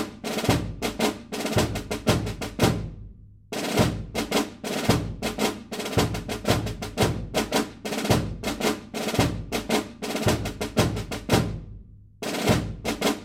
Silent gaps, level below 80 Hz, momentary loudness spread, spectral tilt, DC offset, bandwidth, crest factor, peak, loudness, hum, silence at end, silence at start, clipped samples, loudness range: none; -40 dBFS; 7 LU; -4.5 dB/octave; under 0.1%; 16.5 kHz; 22 dB; -6 dBFS; -26 LUFS; none; 0 s; 0 s; under 0.1%; 1 LU